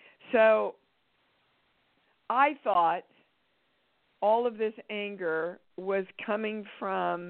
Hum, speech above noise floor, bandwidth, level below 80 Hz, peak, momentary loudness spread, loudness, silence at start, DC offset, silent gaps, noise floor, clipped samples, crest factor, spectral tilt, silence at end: none; 45 dB; 4.3 kHz; -78 dBFS; -10 dBFS; 12 LU; -29 LUFS; 0.25 s; under 0.1%; none; -73 dBFS; under 0.1%; 20 dB; -2.5 dB/octave; 0 s